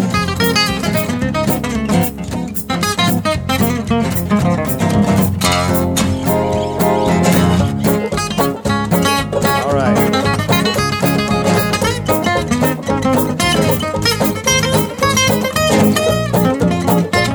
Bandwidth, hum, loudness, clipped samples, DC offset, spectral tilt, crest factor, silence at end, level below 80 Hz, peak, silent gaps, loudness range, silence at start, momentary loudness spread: over 20 kHz; none; -15 LUFS; under 0.1%; under 0.1%; -4.5 dB/octave; 14 dB; 0 s; -34 dBFS; 0 dBFS; none; 2 LU; 0 s; 4 LU